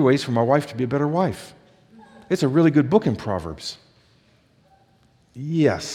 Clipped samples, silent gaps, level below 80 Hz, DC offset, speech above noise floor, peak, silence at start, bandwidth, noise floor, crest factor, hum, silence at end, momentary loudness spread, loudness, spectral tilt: under 0.1%; none; -56 dBFS; under 0.1%; 38 dB; -2 dBFS; 0 s; 14 kHz; -59 dBFS; 20 dB; none; 0 s; 16 LU; -21 LUFS; -6.5 dB/octave